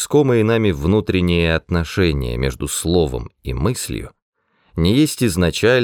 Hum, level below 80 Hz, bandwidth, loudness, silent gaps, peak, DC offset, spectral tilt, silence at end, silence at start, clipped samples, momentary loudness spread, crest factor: none; -32 dBFS; 20 kHz; -18 LUFS; 4.22-4.33 s; -2 dBFS; under 0.1%; -5.5 dB/octave; 0 s; 0 s; under 0.1%; 11 LU; 16 dB